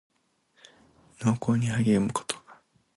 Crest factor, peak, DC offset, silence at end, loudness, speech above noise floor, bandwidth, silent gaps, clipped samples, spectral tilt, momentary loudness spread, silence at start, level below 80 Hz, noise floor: 20 dB; -8 dBFS; under 0.1%; 0.45 s; -27 LUFS; 44 dB; 11.5 kHz; none; under 0.1%; -6 dB/octave; 10 LU; 1.2 s; -60 dBFS; -68 dBFS